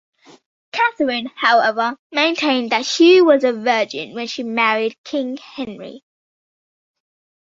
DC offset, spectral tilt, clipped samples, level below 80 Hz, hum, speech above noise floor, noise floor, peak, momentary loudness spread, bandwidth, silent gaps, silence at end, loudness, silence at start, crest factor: under 0.1%; -3 dB/octave; under 0.1%; -66 dBFS; none; over 73 dB; under -90 dBFS; 0 dBFS; 17 LU; 7.8 kHz; 1.99-2.10 s, 4.98-5.04 s; 1.55 s; -17 LUFS; 0.75 s; 18 dB